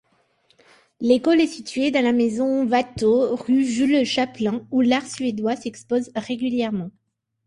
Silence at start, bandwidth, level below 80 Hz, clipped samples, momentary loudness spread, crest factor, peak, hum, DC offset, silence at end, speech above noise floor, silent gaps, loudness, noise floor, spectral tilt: 1 s; 11 kHz; -58 dBFS; under 0.1%; 8 LU; 16 dB; -4 dBFS; none; under 0.1%; 0.55 s; 42 dB; none; -21 LUFS; -63 dBFS; -5 dB/octave